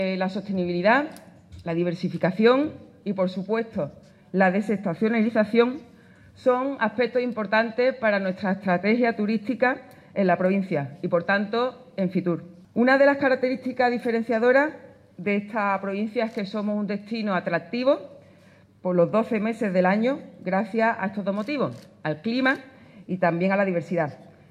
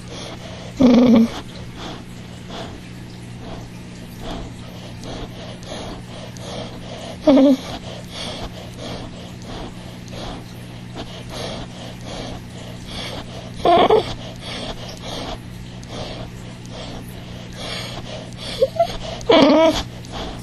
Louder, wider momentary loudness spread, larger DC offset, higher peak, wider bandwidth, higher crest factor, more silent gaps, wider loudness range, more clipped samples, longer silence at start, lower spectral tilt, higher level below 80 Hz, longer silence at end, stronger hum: second, -24 LUFS vs -21 LUFS; second, 10 LU vs 21 LU; neither; second, -8 dBFS vs 0 dBFS; second, 10.5 kHz vs 13 kHz; second, 16 dB vs 22 dB; neither; second, 4 LU vs 13 LU; neither; about the same, 0 s vs 0 s; first, -7.5 dB/octave vs -5.5 dB/octave; second, -70 dBFS vs -40 dBFS; first, 0.25 s vs 0 s; second, none vs 60 Hz at -35 dBFS